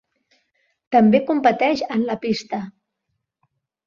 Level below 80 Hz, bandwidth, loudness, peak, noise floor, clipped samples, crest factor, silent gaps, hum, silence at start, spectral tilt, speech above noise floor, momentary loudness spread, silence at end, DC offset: -64 dBFS; 7.2 kHz; -19 LUFS; -2 dBFS; -77 dBFS; under 0.1%; 20 dB; none; none; 0.9 s; -6.5 dB/octave; 58 dB; 15 LU; 1.15 s; under 0.1%